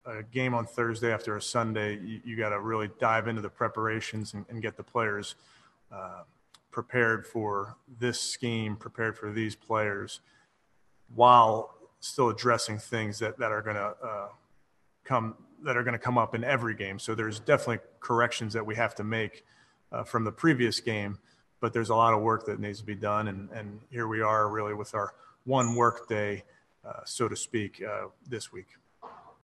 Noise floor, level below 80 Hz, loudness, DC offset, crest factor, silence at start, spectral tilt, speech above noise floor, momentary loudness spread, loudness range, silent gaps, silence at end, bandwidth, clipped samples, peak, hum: -70 dBFS; -70 dBFS; -29 LUFS; under 0.1%; 24 dB; 0.05 s; -5 dB/octave; 41 dB; 15 LU; 7 LU; none; 0.15 s; 12.5 kHz; under 0.1%; -6 dBFS; none